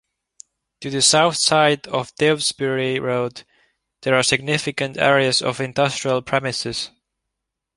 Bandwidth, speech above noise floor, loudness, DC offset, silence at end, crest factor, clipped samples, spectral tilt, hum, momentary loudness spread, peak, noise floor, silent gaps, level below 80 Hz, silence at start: 11.5 kHz; 62 dB; -19 LUFS; under 0.1%; 0.9 s; 20 dB; under 0.1%; -3 dB/octave; none; 11 LU; 0 dBFS; -81 dBFS; none; -58 dBFS; 0.8 s